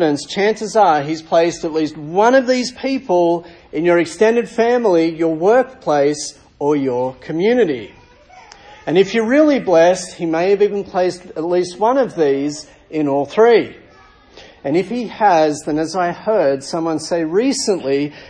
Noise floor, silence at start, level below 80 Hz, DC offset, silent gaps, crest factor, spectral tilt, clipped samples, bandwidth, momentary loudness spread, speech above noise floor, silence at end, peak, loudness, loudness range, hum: -46 dBFS; 0 s; -54 dBFS; under 0.1%; none; 16 dB; -5 dB/octave; under 0.1%; 10.5 kHz; 9 LU; 30 dB; 0 s; -2 dBFS; -16 LUFS; 3 LU; none